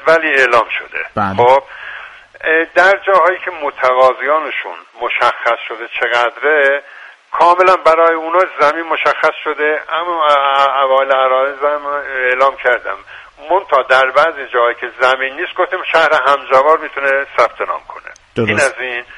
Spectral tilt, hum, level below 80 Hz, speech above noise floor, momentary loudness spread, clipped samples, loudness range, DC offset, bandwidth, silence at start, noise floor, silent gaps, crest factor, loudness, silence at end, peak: -4 dB/octave; none; -54 dBFS; 20 dB; 11 LU; under 0.1%; 2 LU; under 0.1%; 11.5 kHz; 0 s; -33 dBFS; none; 14 dB; -13 LUFS; 0 s; 0 dBFS